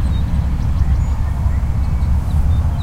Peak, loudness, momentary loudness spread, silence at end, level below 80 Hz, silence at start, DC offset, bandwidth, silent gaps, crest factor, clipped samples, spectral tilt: -4 dBFS; -18 LUFS; 2 LU; 0 s; -16 dBFS; 0 s; under 0.1%; 8.8 kHz; none; 12 dB; under 0.1%; -8 dB/octave